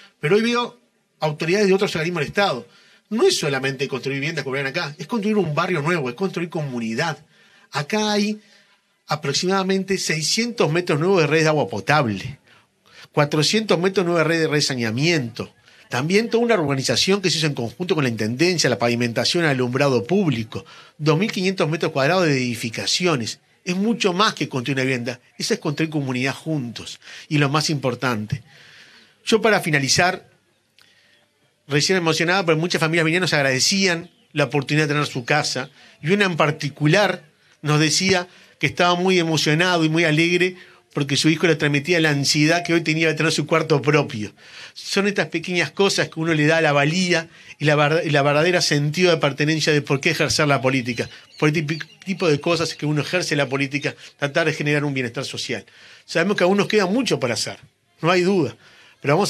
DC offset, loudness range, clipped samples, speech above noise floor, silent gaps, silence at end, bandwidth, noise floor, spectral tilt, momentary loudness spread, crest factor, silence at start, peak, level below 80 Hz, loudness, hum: under 0.1%; 5 LU; under 0.1%; 42 dB; none; 0 s; 14.5 kHz; -62 dBFS; -4.5 dB/octave; 10 LU; 20 dB; 0.25 s; 0 dBFS; -62 dBFS; -20 LUFS; none